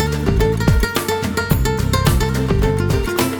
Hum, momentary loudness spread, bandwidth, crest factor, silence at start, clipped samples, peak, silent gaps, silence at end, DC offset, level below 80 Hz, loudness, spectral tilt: none; 3 LU; 19.5 kHz; 16 dB; 0 s; under 0.1%; 0 dBFS; none; 0 s; under 0.1%; -22 dBFS; -17 LUFS; -5.5 dB/octave